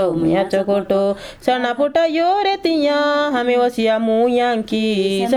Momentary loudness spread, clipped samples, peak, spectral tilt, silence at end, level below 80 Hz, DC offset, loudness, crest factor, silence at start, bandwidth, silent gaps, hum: 3 LU; under 0.1%; -2 dBFS; -5.5 dB/octave; 0 s; -52 dBFS; under 0.1%; -17 LUFS; 14 dB; 0 s; 14 kHz; none; none